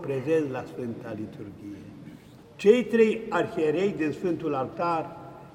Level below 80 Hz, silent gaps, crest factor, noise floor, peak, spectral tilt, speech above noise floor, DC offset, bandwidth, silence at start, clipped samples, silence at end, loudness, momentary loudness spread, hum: -64 dBFS; none; 20 dB; -48 dBFS; -6 dBFS; -7 dB/octave; 22 dB; under 0.1%; 11 kHz; 0 s; under 0.1%; 0.05 s; -26 LUFS; 20 LU; none